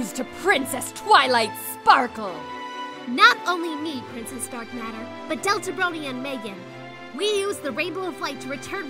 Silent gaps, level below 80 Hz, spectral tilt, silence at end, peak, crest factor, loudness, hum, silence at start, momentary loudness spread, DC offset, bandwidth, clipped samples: none; -64 dBFS; -2.5 dB/octave; 0 s; 0 dBFS; 24 dB; -23 LUFS; none; 0 s; 17 LU; under 0.1%; 16 kHz; under 0.1%